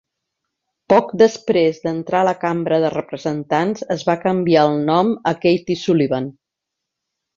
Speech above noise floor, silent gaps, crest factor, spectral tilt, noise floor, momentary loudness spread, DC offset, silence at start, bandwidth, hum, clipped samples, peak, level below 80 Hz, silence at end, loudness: 64 dB; none; 16 dB; -6.5 dB/octave; -81 dBFS; 8 LU; under 0.1%; 0.9 s; 7.6 kHz; none; under 0.1%; -2 dBFS; -60 dBFS; 1.05 s; -18 LUFS